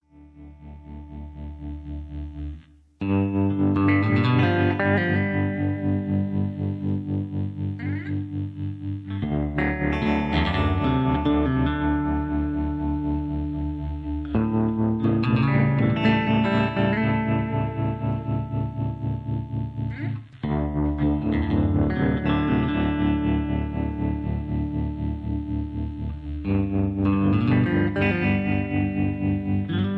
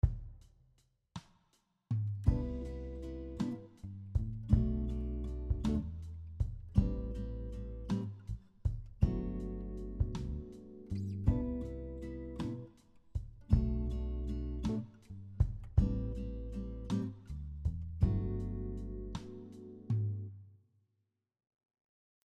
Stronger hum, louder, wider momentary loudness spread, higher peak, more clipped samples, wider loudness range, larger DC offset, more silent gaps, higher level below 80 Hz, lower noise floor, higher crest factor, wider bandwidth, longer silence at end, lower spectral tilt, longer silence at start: neither; first, -24 LUFS vs -38 LUFS; second, 11 LU vs 15 LU; first, -8 dBFS vs -14 dBFS; neither; about the same, 6 LU vs 4 LU; neither; neither; about the same, -36 dBFS vs -40 dBFS; second, -46 dBFS vs -83 dBFS; second, 16 dB vs 24 dB; second, 5.6 kHz vs 8.6 kHz; second, 0 s vs 1.7 s; about the same, -9.5 dB/octave vs -9 dB/octave; about the same, 0.15 s vs 0.05 s